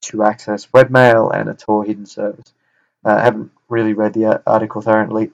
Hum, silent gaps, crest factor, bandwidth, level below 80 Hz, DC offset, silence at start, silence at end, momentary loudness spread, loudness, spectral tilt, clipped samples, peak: none; none; 16 dB; 9.4 kHz; -58 dBFS; under 0.1%; 0 s; 0.05 s; 14 LU; -15 LUFS; -6.5 dB/octave; 0.3%; 0 dBFS